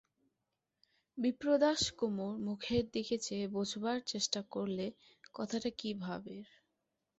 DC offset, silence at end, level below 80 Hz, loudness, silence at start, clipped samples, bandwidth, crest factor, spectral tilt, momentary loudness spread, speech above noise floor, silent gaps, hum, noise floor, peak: under 0.1%; 0.75 s; -66 dBFS; -37 LUFS; 1.15 s; under 0.1%; 8 kHz; 20 dB; -4 dB/octave; 13 LU; 51 dB; none; none; -87 dBFS; -18 dBFS